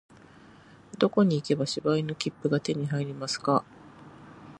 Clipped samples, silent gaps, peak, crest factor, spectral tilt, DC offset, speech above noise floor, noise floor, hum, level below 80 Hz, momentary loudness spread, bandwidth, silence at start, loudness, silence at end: under 0.1%; none; -8 dBFS; 20 dB; -6 dB/octave; under 0.1%; 26 dB; -53 dBFS; none; -68 dBFS; 8 LU; 11 kHz; 0.95 s; -28 LUFS; 0 s